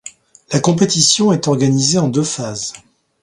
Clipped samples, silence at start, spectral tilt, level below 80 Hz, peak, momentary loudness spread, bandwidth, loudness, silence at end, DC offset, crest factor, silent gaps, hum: under 0.1%; 0.05 s; -4 dB/octave; -54 dBFS; 0 dBFS; 13 LU; 11.5 kHz; -14 LUFS; 0.45 s; under 0.1%; 16 dB; none; none